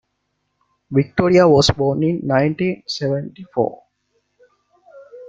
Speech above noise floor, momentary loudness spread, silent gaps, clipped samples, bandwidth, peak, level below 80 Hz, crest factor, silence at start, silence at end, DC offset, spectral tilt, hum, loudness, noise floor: 55 dB; 11 LU; none; under 0.1%; 9.2 kHz; -2 dBFS; -46 dBFS; 18 dB; 0.9 s; 0 s; under 0.1%; -6 dB/octave; 50 Hz at -45 dBFS; -18 LUFS; -72 dBFS